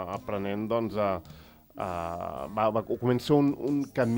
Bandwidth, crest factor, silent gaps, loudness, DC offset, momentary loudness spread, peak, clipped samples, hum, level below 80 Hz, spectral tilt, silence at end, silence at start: 16.5 kHz; 18 dB; none; -29 LUFS; under 0.1%; 10 LU; -12 dBFS; under 0.1%; none; -58 dBFS; -7.5 dB/octave; 0 s; 0 s